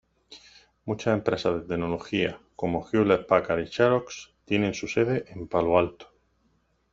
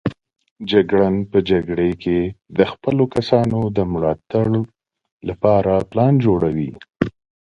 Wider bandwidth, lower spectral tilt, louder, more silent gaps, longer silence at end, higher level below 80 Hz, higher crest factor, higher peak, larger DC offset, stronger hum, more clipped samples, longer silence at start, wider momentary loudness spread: second, 7.8 kHz vs 9.2 kHz; second, -6 dB/octave vs -8.5 dB/octave; second, -26 LUFS vs -18 LUFS; second, none vs 0.51-0.56 s, 5.12-5.20 s; first, 0.9 s vs 0.35 s; second, -56 dBFS vs -42 dBFS; about the same, 22 dB vs 18 dB; second, -6 dBFS vs 0 dBFS; neither; neither; neither; first, 0.3 s vs 0.05 s; about the same, 9 LU vs 9 LU